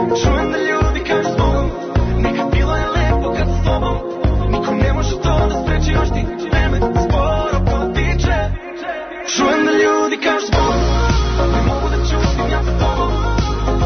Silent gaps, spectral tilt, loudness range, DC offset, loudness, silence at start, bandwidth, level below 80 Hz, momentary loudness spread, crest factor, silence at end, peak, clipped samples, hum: none; -6 dB/octave; 2 LU; under 0.1%; -17 LUFS; 0 s; 6.6 kHz; -20 dBFS; 4 LU; 12 dB; 0 s; -4 dBFS; under 0.1%; none